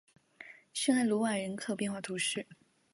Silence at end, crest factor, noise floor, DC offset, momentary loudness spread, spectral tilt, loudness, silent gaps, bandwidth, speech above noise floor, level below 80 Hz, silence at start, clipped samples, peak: 0.4 s; 18 dB; -55 dBFS; under 0.1%; 22 LU; -3.5 dB/octave; -33 LUFS; none; 11.5 kHz; 22 dB; -80 dBFS; 0.4 s; under 0.1%; -16 dBFS